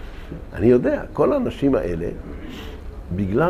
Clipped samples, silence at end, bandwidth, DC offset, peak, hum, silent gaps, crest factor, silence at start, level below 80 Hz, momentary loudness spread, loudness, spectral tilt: under 0.1%; 0 s; 14 kHz; under 0.1%; -4 dBFS; none; none; 18 dB; 0 s; -36 dBFS; 19 LU; -21 LUFS; -8.5 dB/octave